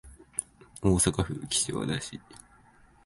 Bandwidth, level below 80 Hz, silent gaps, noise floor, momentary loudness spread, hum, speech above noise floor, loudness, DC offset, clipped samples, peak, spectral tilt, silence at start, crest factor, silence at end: 12 kHz; -46 dBFS; none; -58 dBFS; 16 LU; none; 30 dB; -29 LUFS; under 0.1%; under 0.1%; -8 dBFS; -4 dB/octave; 0.05 s; 24 dB; 0.7 s